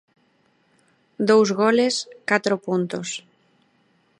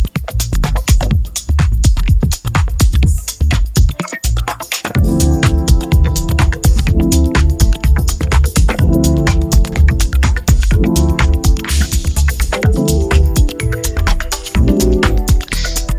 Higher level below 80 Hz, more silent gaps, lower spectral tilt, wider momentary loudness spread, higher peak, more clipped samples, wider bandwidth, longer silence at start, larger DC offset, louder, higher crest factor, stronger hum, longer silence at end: second, -72 dBFS vs -14 dBFS; neither; about the same, -4.5 dB/octave vs -5 dB/octave; first, 12 LU vs 5 LU; about the same, -2 dBFS vs 0 dBFS; neither; second, 11 kHz vs 16 kHz; first, 1.2 s vs 0 s; neither; second, -21 LUFS vs -14 LUFS; first, 20 dB vs 12 dB; neither; first, 1 s vs 0 s